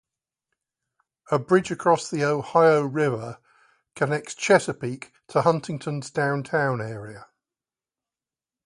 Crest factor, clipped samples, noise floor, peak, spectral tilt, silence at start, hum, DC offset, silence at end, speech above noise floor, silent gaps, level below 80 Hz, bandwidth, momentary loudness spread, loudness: 22 dB; under 0.1%; under -90 dBFS; -4 dBFS; -5.5 dB/octave; 1.3 s; none; under 0.1%; 1.4 s; over 67 dB; none; -66 dBFS; 11.5 kHz; 14 LU; -23 LUFS